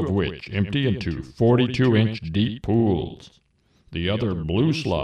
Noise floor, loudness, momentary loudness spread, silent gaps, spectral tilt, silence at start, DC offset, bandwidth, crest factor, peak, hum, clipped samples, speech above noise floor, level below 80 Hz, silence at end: -60 dBFS; -22 LUFS; 8 LU; none; -7.5 dB/octave; 0 s; under 0.1%; 9.4 kHz; 16 dB; -6 dBFS; none; under 0.1%; 38 dB; -44 dBFS; 0 s